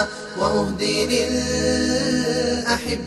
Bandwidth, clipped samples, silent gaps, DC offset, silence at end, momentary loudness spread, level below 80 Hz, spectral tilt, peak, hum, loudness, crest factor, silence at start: 13 kHz; under 0.1%; none; under 0.1%; 0 s; 2 LU; -40 dBFS; -3.5 dB/octave; -6 dBFS; none; -21 LUFS; 16 dB; 0 s